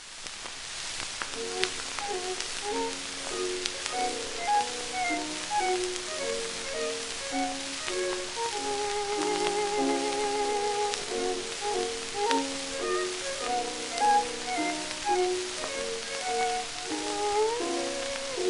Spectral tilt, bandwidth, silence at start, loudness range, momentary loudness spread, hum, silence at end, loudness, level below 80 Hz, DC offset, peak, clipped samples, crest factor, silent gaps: -1.5 dB/octave; 11.5 kHz; 0 s; 2 LU; 5 LU; none; 0 s; -30 LUFS; -56 dBFS; under 0.1%; -2 dBFS; under 0.1%; 28 dB; none